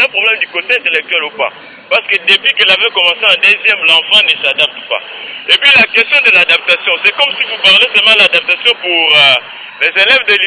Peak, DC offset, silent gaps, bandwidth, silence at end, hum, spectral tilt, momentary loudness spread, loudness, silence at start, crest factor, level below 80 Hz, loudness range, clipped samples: 0 dBFS; under 0.1%; none; 11 kHz; 0 s; none; -1.5 dB/octave; 9 LU; -7 LUFS; 0 s; 10 dB; -56 dBFS; 2 LU; 1%